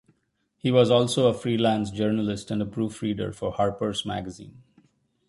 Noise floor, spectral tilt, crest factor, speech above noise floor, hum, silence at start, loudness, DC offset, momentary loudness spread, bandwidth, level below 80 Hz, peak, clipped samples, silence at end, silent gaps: -73 dBFS; -6 dB/octave; 20 dB; 48 dB; none; 0.65 s; -25 LUFS; under 0.1%; 10 LU; 11.5 kHz; -54 dBFS; -6 dBFS; under 0.1%; 0.8 s; none